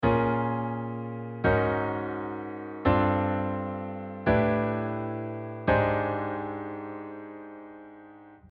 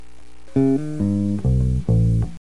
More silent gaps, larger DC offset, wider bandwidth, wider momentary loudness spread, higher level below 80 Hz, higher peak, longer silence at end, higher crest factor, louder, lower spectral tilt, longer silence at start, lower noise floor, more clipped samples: neither; second, under 0.1% vs 3%; second, 5.2 kHz vs 11 kHz; first, 17 LU vs 3 LU; second, -48 dBFS vs -28 dBFS; second, -10 dBFS vs -6 dBFS; about the same, 0.15 s vs 0.05 s; about the same, 18 dB vs 14 dB; second, -29 LUFS vs -20 LUFS; about the same, -10 dB/octave vs -10 dB/octave; second, 0 s vs 0.55 s; about the same, -50 dBFS vs -48 dBFS; neither